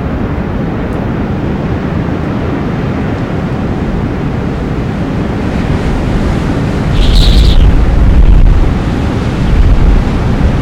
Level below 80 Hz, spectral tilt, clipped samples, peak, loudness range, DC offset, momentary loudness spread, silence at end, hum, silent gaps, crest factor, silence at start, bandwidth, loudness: -12 dBFS; -7.5 dB/octave; under 0.1%; 0 dBFS; 5 LU; under 0.1%; 7 LU; 0 s; none; none; 10 dB; 0 s; 9.8 kHz; -12 LUFS